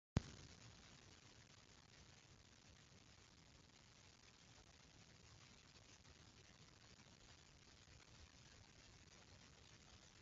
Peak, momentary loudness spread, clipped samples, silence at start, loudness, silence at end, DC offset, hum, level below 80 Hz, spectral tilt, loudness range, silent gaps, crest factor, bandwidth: -22 dBFS; 4 LU; under 0.1%; 0.15 s; -62 LUFS; 0 s; under 0.1%; none; -68 dBFS; -5 dB/octave; 1 LU; none; 38 dB; 7.6 kHz